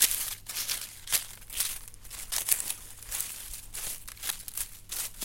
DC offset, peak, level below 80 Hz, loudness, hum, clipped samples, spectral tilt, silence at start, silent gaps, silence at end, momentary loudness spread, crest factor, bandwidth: under 0.1%; -2 dBFS; -52 dBFS; -32 LUFS; none; under 0.1%; 1.5 dB/octave; 0 s; none; 0 s; 11 LU; 32 dB; 17 kHz